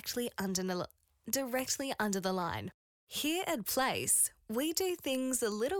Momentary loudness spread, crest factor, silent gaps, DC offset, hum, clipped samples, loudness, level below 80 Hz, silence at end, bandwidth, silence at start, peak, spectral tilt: 11 LU; 18 dB; 2.74-3.07 s; under 0.1%; none; under 0.1%; -33 LUFS; -68 dBFS; 0 s; 19.5 kHz; 0.05 s; -16 dBFS; -2.5 dB/octave